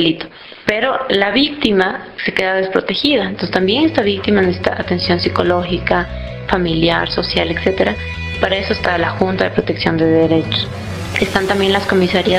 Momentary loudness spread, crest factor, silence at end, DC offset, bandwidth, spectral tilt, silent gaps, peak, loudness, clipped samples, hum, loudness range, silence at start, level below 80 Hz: 6 LU; 16 dB; 0 s; under 0.1%; 14.5 kHz; -6 dB/octave; none; 0 dBFS; -16 LUFS; under 0.1%; none; 1 LU; 0 s; -36 dBFS